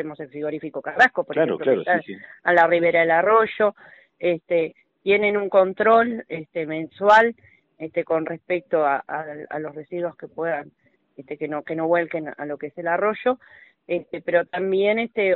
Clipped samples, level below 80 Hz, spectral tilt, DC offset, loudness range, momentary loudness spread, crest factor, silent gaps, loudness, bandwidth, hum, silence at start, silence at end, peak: under 0.1%; -66 dBFS; -3 dB/octave; under 0.1%; 8 LU; 14 LU; 16 dB; none; -22 LUFS; 7.4 kHz; none; 0 s; 0 s; -6 dBFS